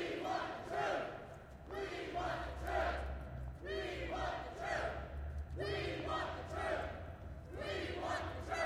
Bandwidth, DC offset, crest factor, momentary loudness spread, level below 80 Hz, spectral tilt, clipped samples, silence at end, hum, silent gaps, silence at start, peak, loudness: 16 kHz; under 0.1%; 16 dB; 9 LU; -52 dBFS; -5.5 dB/octave; under 0.1%; 0 s; none; none; 0 s; -26 dBFS; -42 LUFS